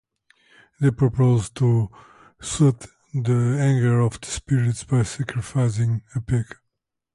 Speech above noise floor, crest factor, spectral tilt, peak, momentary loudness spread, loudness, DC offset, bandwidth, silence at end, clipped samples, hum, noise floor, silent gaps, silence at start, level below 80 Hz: 58 dB; 14 dB; -7 dB/octave; -8 dBFS; 11 LU; -22 LUFS; under 0.1%; 11.5 kHz; 0.7 s; under 0.1%; none; -79 dBFS; none; 0.8 s; -46 dBFS